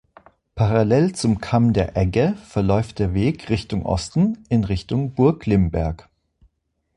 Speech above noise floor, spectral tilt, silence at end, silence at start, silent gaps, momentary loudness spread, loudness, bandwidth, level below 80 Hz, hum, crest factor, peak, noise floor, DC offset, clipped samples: 50 dB; -7.5 dB/octave; 1 s; 0.55 s; none; 6 LU; -20 LUFS; 11 kHz; -36 dBFS; none; 18 dB; -2 dBFS; -70 dBFS; under 0.1%; under 0.1%